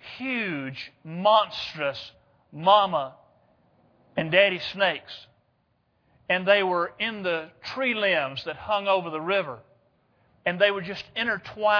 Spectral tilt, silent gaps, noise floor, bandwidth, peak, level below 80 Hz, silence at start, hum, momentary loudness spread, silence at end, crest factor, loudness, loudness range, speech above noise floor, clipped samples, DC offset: -5.5 dB/octave; none; -70 dBFS; 5.4 kHz; -6 dBFS; -66 dBFS; 0 s; none; 16 LU; 0 s; 22 dB; -25 LUFS; 2 LU; 44 dB; under 0.1%; under 0.1%